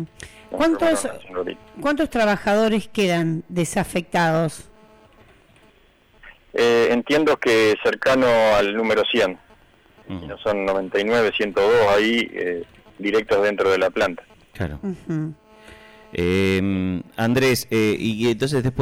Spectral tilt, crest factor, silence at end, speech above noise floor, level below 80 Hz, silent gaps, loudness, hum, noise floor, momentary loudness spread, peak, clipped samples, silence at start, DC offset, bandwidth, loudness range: -5 dB/octave; 8 dB; 0 s; 35 dB; -48 dBFS; none; -20 LUFS; none; -55 dBFS; 13 LU; -12 dBFS; under 0.1%; 0 s; under 0.1%; 16.5 kHz; 5 LU